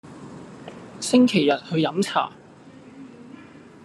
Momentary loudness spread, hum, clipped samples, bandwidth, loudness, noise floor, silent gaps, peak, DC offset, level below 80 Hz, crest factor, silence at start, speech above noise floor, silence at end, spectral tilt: 26 LU; none; under 0.1%; 12.5 kHz; -21 LUFS; -46 dBFS; none; -6 dBFS; under 0.1%; -68 dBFS; 20 dB; 0.05 s; 26 dB; 0.4 s; -5 dB/octave